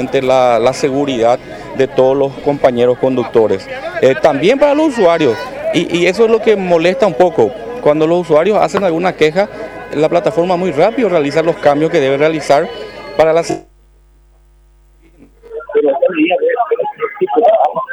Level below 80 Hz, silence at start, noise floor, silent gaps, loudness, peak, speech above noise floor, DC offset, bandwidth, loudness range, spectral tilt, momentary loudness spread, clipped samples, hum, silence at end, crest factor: -48 dBFS; 0 s; -46 dBFS; none; -13 LUFS; 0 dBFS; 34 dB; under 0.1%; 12 kHz; 6 LU; -5.5 dB/octave; 8 LU; under 0.1%; none; 0 s; 12 dB